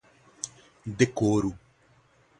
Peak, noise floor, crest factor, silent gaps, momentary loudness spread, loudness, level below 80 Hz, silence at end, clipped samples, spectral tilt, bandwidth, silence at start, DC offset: -6 dBFS; -62 dBFS; 24 dB; none; 16 LU; -28 LUFS; -56 dBFS; 0.8 s; under 0.1%; -5.5 dB/octave; 11.5 kHz; 0.45 s; under 0.1%